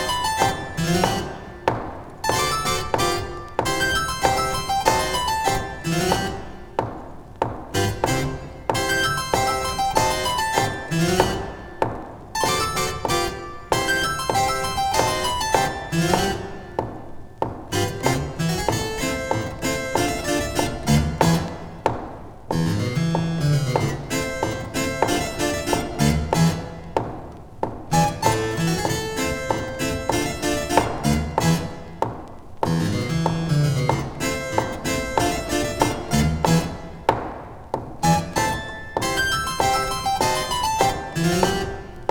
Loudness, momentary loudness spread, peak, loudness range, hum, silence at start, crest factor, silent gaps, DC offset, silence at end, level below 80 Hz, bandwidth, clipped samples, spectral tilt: -23 LUFS; 10 LU; -2 dBFS; 2 LU; none; 0 s; 22 dB; none; under 0.1%; 0 s; -38 dBFS; over 20 kHz; under 0.1%; -4.5 dB/octave